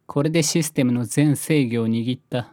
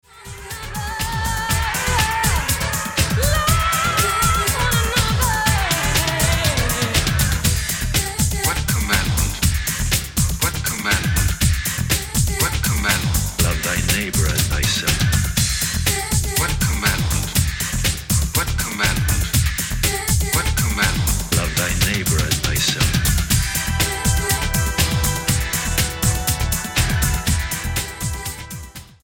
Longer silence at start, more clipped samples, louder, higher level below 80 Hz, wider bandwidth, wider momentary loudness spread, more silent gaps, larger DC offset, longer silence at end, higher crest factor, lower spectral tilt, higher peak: about the same, 0.1 s vs 0.15 s; neither; about the same, -21 LUFS vs -19 LUFS; second, -64 dBFS vs -26 dBFS; about the same, 18 kHz vs 17.5 kHz; about the same, 5 LU vs 4 LU; neither; neither; second, 0.05 s vs 0.2 s; about the same, 16 dB vs 18 dB; first, -5.5 dB/octave vs -3 dB/octave; second, -6 dBFS vs -2 dBFS